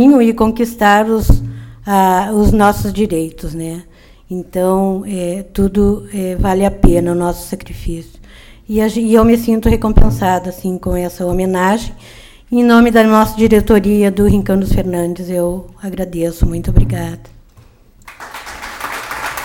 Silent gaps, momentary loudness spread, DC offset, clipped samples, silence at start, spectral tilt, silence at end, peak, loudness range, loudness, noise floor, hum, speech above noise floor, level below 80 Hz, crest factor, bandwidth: none; 16 LU; under 0.1%; 0.2%; 0 s; -6.5 dB/octave; 0 s; 0 dBFS; 7 LU; -14 LUFS; -44 dBFS; none; 32 dB; -22 dBFS; 14 dB; 17.5 kHz